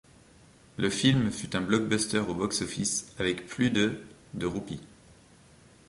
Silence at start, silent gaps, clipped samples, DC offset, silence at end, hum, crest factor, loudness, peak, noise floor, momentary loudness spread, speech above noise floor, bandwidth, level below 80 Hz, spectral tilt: 0.8 s; none; under 0.1%; under 0.1%; 1.05 s; none; 20 dB; -29 LUFS; -10 dBFS; -57 dBFS; 15 LU; 28 dB; 11.5 kHz; -56 dBFS; -4 dB/octave